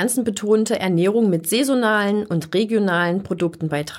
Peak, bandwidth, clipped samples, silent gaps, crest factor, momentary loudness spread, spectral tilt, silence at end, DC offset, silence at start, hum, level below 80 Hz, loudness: -6 dBFS; 16.5 kHz; under 0.1%; none; 14 dB; 5 LU; -5 dB/octave; 0 s; under 0.1%; 0 s; none; -60 dBFS; -19 LUFS